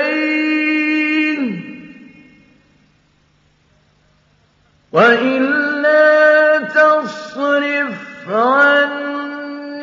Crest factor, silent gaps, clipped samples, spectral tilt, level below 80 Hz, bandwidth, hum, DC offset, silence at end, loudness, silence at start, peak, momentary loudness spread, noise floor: 16 dB; none; under 0.1%; -5.5 dB/octave; -68 dBFS; 7.6 kHz; none; under 0.1%; 0 s; -14 LUFS; 0 s; 0 dBFS; 16 LU; -56 dBFS